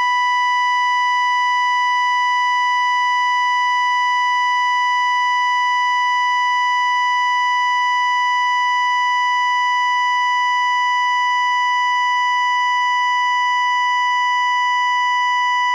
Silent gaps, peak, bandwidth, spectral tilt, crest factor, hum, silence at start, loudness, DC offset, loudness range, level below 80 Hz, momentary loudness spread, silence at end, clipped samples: none; -10 dBFS; 10.5 kHz; 10 dB/octave; 6 dB; none; 0 s; -16 LUFS; under 0.1%; 0 LU; under -90 dBFS; 0 LU; 0 s; under 0.1%